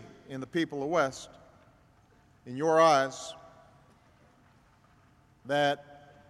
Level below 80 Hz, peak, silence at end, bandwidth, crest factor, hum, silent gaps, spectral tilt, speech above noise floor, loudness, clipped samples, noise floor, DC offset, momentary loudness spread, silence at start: -70 dBFS; -10 dBFS; 0.3 s; 13 kHz; 22 dB; none; none; -4.5 dB/octave; 34 dB; -28 LUFS; under 0.1%; -62 dBFS; under 0.1%; 22 LU; 0 s